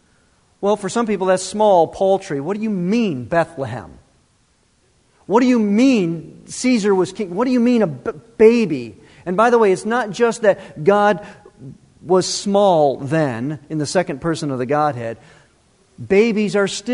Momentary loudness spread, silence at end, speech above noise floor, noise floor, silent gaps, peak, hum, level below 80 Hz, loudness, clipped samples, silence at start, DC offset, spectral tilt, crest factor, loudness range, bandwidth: 12 LU; 0 s; 42 dB; -59 dBFS; none; 0 dBFS; none; -54 dBFS; -17 LUFS; under 0.1%; 0.6 s; under 0.1%; -5.5 dB/octave; 18 dB; 4 LU; 11 kHz